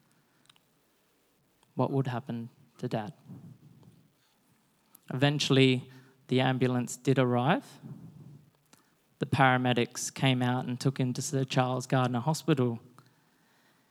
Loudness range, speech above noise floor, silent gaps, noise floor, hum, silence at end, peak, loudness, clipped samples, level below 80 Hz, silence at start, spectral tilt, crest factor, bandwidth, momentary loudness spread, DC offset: 9 LU; 41 dB; none; -70 dBFS; none; 1.1 s; -8 dBFS; -29 LUFS; under 0.1%; -76 dBFS; 1.75 s; -5.5 dB/octave; 24 dB; 15 kHz; 20 LU; under 0.1%